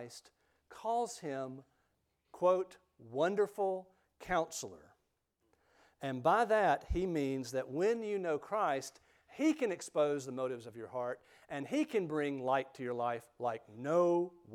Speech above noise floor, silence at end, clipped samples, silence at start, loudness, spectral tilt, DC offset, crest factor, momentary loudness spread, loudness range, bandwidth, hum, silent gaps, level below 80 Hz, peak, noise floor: 46 dB; 0 s; under 0.1%; 0 s; -36 LUFS; -5.5 dB/octave; under 0.1%; 18 dB; 14 LU; 4 LU; 15.5 kHz; none; none; -58 dBFS; -18 dBFS; -81 dBFS